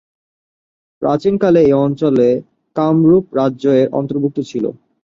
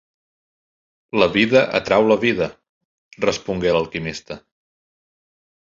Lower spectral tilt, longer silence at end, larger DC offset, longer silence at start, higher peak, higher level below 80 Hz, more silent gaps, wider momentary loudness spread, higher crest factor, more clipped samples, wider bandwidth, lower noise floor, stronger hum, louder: first, -9 dB/octave vs -5 dB/octave; second, 0.3 s vs 1.35 s; neither; second, 1 s vs 1.15 s; about the same, -2 dBFS vs 0 dBFS; about the same, -52 dBFS vs -50 dBFS; second, none vs 2.69-3.11 s; second, 10 LU vs 13 LU; second, 14 dB vs 20 dB; neither; about the same, 7.4 kHz vs 7.6 kHz; about the same, under -90 dBFS vs under -90 dBFS; neither; first, -15 LUFS vs -19 LUFS